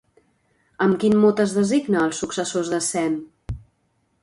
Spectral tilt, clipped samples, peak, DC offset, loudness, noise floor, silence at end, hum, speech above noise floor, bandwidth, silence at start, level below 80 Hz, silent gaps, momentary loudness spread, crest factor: -5 dB/octave; under 0.1%; -6 dBFS; under 0.1%; -21 LUFS; -68 dBFS; 0.65 s; none; 48 dB; 11.5 kHz; 0.8 s; -48 dBFS; none; 18 LU; 16 dB